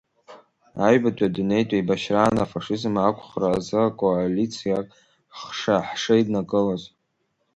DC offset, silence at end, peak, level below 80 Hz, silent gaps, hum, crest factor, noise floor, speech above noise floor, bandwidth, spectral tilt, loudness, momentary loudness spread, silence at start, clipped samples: under 0.1%; 0.7 s; -4 dBFS; -54 dBFS; none; none; 18 dB; -72 dBFS; 50 dB; 11 kHz; -6 dB/octave; -23 LUFS; 8 LU; 0.3 s; under 0.1%